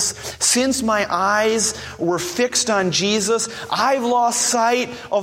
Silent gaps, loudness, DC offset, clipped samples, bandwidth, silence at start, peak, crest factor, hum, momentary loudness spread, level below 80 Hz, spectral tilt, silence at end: none; -18 LUFS; under 0.1%; under 0.1%; 16.5 kHz; 0 s; -4 dBFS; 16 dB; none; 6 LU; -52 dBFS; -2 dB/octave; 0 s